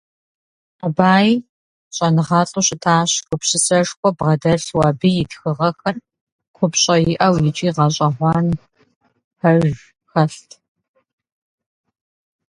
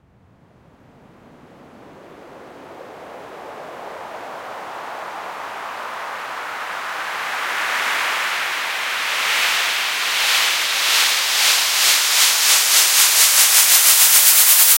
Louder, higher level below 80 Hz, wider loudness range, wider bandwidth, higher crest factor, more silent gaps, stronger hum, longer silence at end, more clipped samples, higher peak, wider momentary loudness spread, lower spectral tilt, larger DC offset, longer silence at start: second, -17 LUFS vs -13 LUFS; first, -50 dBFS vs -70 dBFS; second, 6 LU vs 22 LU; second, 11.5 kHz vs 16.5 kHz; about the same, 18 dB vs 18 dB; first, 1.49-1.91 s, 3.97-4.03 s, 6.21-6.39 s, 6.48-6.54 s, 8.96-9.01 s, 9.24-9.31 s vs none; neither; first, 2.2 s vs 0 s; neither; about the same, 0 dBFS vs 0 dBFS; second, 9 LU vs 23 LU; first, -4.5 dB/octave vs 3.5 dB/octave; neither; second, 0.85 s vs 1.8 s